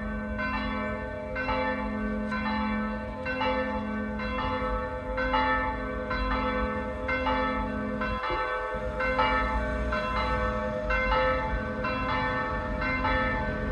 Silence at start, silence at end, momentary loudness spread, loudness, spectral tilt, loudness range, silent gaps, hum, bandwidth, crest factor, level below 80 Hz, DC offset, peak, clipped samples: 0 s; 0 s; 6 LU; -29 LUFS; -7 dB/octave; 3 LU; none; none; 9.4 kHz; 16 dB; -38 dBFS; under 0.1%; -12 dBFS; under 0.1%